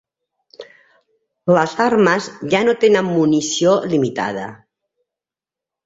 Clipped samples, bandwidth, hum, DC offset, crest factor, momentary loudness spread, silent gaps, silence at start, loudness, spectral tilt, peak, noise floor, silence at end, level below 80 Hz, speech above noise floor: under 0.1%; 7.8 kHz; none; under 0.1%; 16 dB; 10 LU; none; 0.6 s; -16 LUFS; -5 dB/octave; -2 dBFS; -88 dBFS; 1.3 s; -60 dBFS; 73 dB